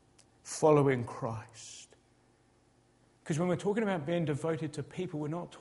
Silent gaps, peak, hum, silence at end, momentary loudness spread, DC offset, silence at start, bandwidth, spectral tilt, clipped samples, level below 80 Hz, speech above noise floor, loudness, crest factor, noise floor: none; -14 dBFS; none; 0 s; 21 LU; under 0.1%; 0.45 s; 11.5 kHz; -6.5 dB/octave; under 0.1%; -68 dBFS; 36 dB; -32 LUFS; 20 dB; -67 dBFS